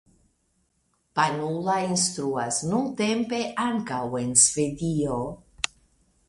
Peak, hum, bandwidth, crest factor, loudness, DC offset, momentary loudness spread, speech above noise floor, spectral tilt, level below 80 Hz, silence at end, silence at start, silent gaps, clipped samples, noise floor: -2 dBFS; none; 11.5 kHz; 24 dB; -25 LUFS; under 0.1%; 13 LU; 46 dB; -3.5 dB/octave; -56 dBFS; 0.65 s; 1.15 s; none; under 0.1%; -71 dBFS